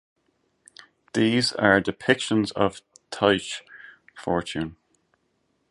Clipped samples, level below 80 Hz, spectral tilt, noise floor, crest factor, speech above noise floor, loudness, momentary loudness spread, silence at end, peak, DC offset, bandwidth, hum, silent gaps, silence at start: under 0.1%; -56 dBFS; -4.5 dB/octave; -71 dBFS; 24 dB; 48 dB; -24 LUFS; 15 LU; 1 s; -2 dBFS; under 0.1%; 11.5 kHz; none; none; 1.15 s